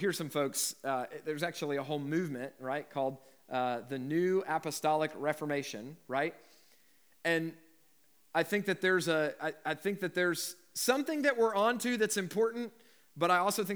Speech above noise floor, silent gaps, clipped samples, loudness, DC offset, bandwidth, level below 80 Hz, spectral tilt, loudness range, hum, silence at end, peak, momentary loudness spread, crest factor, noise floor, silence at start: 36 dB; none; under 0.1%; -33 LUFS; under 0.1%; over 20 kHz; under -90 dBFS; -4 dB/octave; 5 LU; none; 0 s; -14 dBFS; 9 LU; 20 dB; -69 dBFS; 0 s